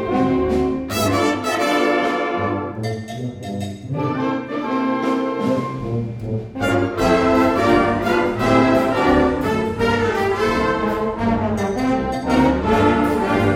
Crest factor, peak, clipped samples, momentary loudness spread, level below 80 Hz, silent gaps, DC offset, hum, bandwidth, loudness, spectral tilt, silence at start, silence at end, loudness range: 16 dB; -2 dBFS; under 0.1%; 10 LU; -38 dBFS; none; under 0.1%; none; 17.5 kHz; -19 LUFS; -6 dB/octave; 0 s; 0 s; 6 LU